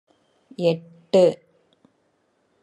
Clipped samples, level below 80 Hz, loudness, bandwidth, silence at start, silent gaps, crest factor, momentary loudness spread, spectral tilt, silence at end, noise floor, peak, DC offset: under 0.1%; -76 dBFS; -21 LUFS; 11 kHz; 0.6 s; none; 20 dB; 20 LU; -6.5 dB/octave; 1.25 s; -67 dBFS; -6 dBFS; under 0.1%